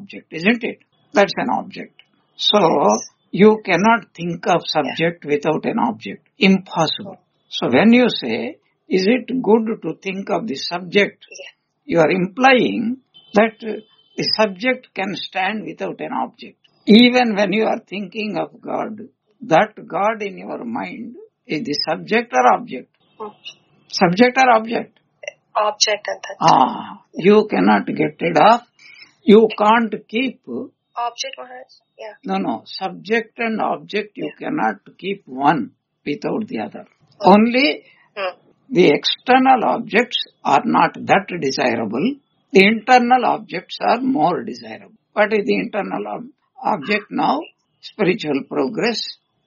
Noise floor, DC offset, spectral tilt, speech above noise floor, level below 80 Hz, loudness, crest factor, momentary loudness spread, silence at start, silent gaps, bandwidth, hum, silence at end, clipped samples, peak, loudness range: -45 dBFS; under 0.1%; -3 dB/octave; 28 dB; -64 dBFS; -18 LUFS; 18 dB; 18 LU; 0 s; none; 7.2 kHz; none; 0.35 s; under 0.1%; 0 dBFS; 6 LU